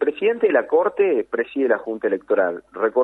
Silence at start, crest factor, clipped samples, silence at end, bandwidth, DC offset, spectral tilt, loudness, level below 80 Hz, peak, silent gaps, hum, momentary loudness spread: 0 s; 16 dB; under 0.1%; 0 s; 4.1 kHz; under 0.1%; -7.5 dB/octave; -21 LUFS; -66 dBFS; -4 dBFS; none; none; 6 LU